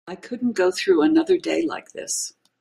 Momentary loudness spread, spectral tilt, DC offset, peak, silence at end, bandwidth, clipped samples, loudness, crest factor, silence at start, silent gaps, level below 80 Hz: 14 LU; -3 dB/octave; under 0.1%; -8 dBFS; 0.3 s; 15 kHz; under 0.1%; -21 LUFS; 14 dB; 0.05 s; none; -66 dBFS